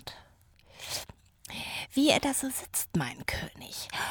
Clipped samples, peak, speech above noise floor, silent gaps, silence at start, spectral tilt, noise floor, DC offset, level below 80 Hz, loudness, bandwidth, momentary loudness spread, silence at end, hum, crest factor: under 0.1%; -8 dBFS; 30 dB; none; 0 s; -3 dB/octave; -60 dBFS; under 0.1%; -54 dBFS; -31 LUFS; over 20 kHz; 21 LU; 0 s; none; 24 dB